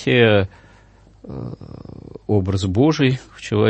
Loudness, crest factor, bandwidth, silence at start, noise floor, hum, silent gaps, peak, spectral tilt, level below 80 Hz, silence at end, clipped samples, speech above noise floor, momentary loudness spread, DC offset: -18 LUFS; 18 dB; 8.6 kHz; 0 s; -49 dBFS; none; none; -2 dBFS; -6.5 dB/octave; -48 dBFS; 0 s; under 0.1%; 31 dB; 22 LU; under 0.1%